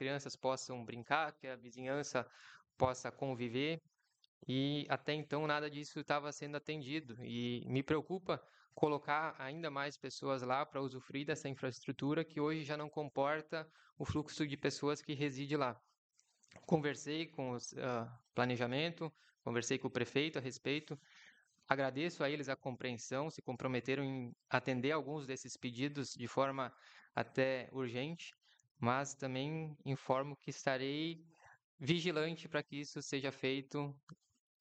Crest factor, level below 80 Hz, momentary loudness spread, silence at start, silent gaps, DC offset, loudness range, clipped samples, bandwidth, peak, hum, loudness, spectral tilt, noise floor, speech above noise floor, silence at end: 28 dB; -76 dBFS; 9 LU; 0 s; 4.28-4.41 s, 13.92-13.96 s, 15.98-16.10 s, 28.71-28.75 s, 31.64-31.78 s, 34.03-34.07 s; under 0.1%; 1 LU; under 0.1%; 8.8 kHz; -12 dBFS; none; -40 LUFS; -5 dB/octave; -67 dBFS; 27 dB; 0.45 s